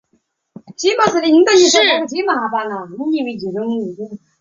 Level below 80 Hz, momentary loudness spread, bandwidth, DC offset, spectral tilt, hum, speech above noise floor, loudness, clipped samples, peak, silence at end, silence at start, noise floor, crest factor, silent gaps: -62 dBFS; 15 LU; 7.6 kHz; under 0.1%; -2.5 dB/octave; none; 49 dB; -15 LUFS; under 0.1%; 0 dBFS; 0.25 s; 0.7 s; -64 dBFS; 16 dB; none